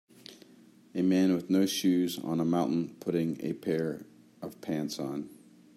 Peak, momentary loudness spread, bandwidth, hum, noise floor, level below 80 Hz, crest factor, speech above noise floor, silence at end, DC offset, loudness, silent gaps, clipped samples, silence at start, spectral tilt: -16 dBFS; 18 LU; 16 kHz; none; -57 dBFS; -74 dBFS; 14 dB; 28 dB; 0.4 s; under 0.1%; -30 LUFS; none; under 0.1%; 0.3 s; -6 dB/octave